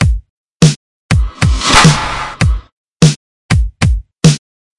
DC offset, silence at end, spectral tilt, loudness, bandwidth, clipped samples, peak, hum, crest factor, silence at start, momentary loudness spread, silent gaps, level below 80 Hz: under 0.1%; 0.4 s; -4.5 dB/octave; -12 LUFS; 12 kHz; 0.5%; 0 dBFS; none; 12 dB; 0 s; 13 LU; 0.30-0.60 s, 0.76-1.09 s, 2.72-3.00 s, 3.16-3.49 s; -20 dBFS